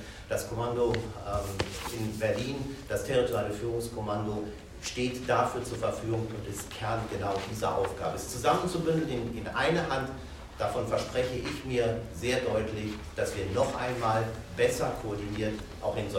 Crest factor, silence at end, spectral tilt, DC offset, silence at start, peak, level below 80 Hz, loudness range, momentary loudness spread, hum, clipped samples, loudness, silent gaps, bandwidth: 20 dB; 0 s; -5 dB/octave; under 0.1%; 0 s; -12 dBFS; -48 dBFS; 2 LU; 7 LU; none; under 0.1%; -31 LUFS; none; 16 kHz